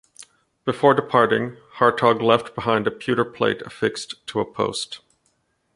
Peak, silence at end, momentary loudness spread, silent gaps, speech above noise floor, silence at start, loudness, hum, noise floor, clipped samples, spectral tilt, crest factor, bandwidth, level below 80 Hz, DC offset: -2 dBFS; 0.8 s; 12 LU; none; 47 dB; 0.2 s; -21 LUFS; none; -68 dBFS; under 0.1%; -5 dB/octave; 20 dB; 11.5 kHz; -60 dBFS; under 0.1%